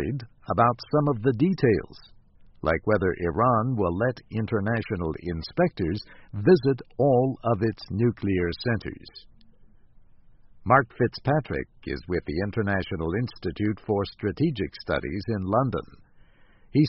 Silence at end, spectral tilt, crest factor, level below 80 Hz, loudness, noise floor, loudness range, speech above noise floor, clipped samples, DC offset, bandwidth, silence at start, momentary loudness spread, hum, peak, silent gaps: 0 s; -6.5 dB/octave; 22 dB; -48 dBFS; -26 LUFS; -54 dBFS; 4 LU; 29 dB; under 0.1%; under 0.1%; 5.8 kHz; 0 s; 10 LU; none; -4 dBFS; none